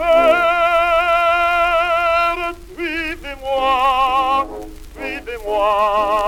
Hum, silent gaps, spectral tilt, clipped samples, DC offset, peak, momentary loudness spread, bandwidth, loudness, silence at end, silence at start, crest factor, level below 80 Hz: none; none; -3.5 dB/octave; under 0.1%; under 0.1%; -2 dBFS; 12 LU; 16.5 kHz; -16 LUFS; 0 s; 0 s; 14 dB; -38 dBFS